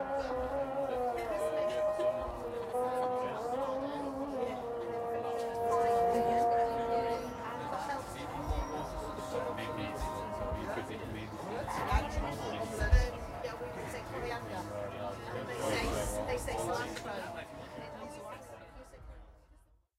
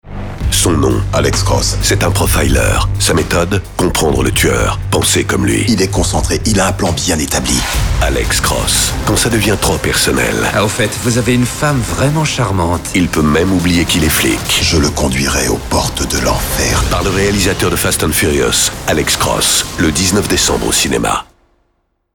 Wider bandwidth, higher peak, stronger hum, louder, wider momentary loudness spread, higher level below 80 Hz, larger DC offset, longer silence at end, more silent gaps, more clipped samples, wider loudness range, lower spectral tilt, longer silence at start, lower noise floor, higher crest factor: second, 16 kHz vs over 20 kHz; second, -14 dBFS vs -2 dBFS; neither; second, -36 LUFS vs -12 LUFS; first, 11 LU vs 3 LU; second, -44 dBFS vs -24 dBFS; neither; second, 0.6 s vs 0.9 s; neither; neither; first, 6 LU vs 1 LU; first, -5.5 dB/octave vs -3.5 dB/octave; about the same, 0 s vs 0.05 s; about the same, -64 dBFS vs -63 dBFS; first, 22 dB vs 10 dB